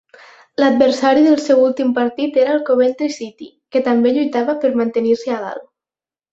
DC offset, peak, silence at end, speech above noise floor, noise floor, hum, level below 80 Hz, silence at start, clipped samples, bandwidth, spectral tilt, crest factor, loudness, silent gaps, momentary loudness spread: under 0.1%; -2 dBFS; 0.7 s; over 75 dB; under -90 dBFS; none; -62 dBFS; 0.6 s; under 0.1%; 8 kHz; -5 dB/octave; 14 dB; -16 LUFS; none; 11 LU